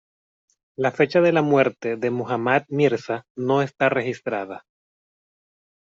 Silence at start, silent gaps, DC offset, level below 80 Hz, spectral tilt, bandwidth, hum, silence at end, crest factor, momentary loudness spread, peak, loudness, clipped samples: 0.8 s; 3.30-3.35 s; under 0.1%; -68 dBFS; -7 dB/octave; 7.6 kHz; none; 1.25 s; 18 dB; 11 LU; -6 dBFS; -22 LUFS; under 0.1%